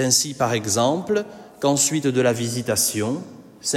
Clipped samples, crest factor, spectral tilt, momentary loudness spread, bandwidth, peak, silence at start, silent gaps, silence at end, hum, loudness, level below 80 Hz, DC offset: under 0.1%; 18 dB; -3.5 dB/octave; 10 LU; 16.5 kHz; -4 dBFS; 0 s; none; 0 s; none; -21 LUFS; -60 dBFS; under 0.1%